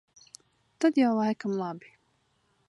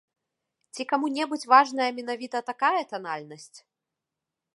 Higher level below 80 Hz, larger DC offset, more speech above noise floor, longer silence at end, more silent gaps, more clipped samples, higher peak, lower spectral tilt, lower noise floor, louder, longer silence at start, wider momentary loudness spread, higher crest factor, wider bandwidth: first, -80 dBFS vs -88 dBFS; neither; second, 45 dB vs 61 dB; about the same, 0.9 s vs 1 s; neither; neither; second, -12 dBFS vs -4 dBFS; first, -6 dB/octave vs -3 dB/octave; second, -71 dBFS vs -87 dBFS; about the same, -27 LUFS vs -25 LUFS; about the same, 0.8 s vs 0.75 s; second, 13 LU vs 18 LU; second, 18 dB vs 24 dB; about the same, 11.5 kHz vs 11.5 kHz